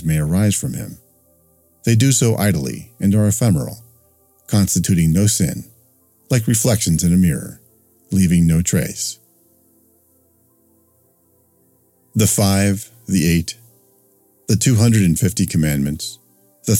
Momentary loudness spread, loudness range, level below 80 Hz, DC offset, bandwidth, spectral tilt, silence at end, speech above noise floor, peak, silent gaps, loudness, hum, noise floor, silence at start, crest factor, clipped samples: 14 LU; 4 LU; -40 dBFS; under 0.1%; 17 kHz; -5 dB/octave; 0 s; 42 dB; 0 dBFS; none; -17 LUFS; none; -58 dBFS; 0 s; 18 dB; under 0.1%